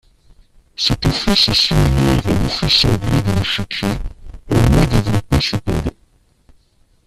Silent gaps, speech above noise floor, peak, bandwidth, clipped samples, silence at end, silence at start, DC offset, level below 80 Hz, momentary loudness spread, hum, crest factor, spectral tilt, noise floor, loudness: none; 40 dB; 0 dBFS; 14.5 kHz; under 0.1%; 1.15 s; 0.8 s; under 0.1%; -26 dBFS; 10 LU; none; 16 dB; -5 dB/octave; -55 dBFS; -15 LUFS